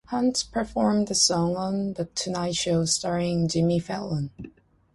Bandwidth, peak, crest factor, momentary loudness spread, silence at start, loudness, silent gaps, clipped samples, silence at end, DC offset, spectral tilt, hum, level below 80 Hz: 11.5 kHz; -6 dBFS; 18 dB; 10 LU; 0.1 s; -25 LUFS; none; under 0.1%; 0.45 s; under 0.1%; -4.5 dB/octave; none; -52 dBFS